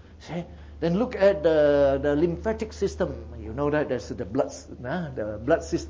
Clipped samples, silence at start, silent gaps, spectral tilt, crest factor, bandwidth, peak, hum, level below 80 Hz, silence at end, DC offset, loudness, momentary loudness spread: under 0.1%; 0.05 s; none; -6.5 dB/octave; 16 dB; 7.8 kHz; -8 dBFS; none; -42 dBFS; 0 s; under 0.1%; -25 LUFS; 16 LU